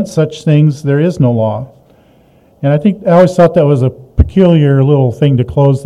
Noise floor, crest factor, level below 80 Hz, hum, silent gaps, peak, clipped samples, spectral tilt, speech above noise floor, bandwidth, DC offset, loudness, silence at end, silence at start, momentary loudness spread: -46 dBFS; 10 dB; -26 dBFS; none; none; 0 dBFS; 1%; -8.5 dB/octave; 37 dB; 10.5 kHz; under 0.1%; -10 LUFS; 0 s; 0 s; 7 LU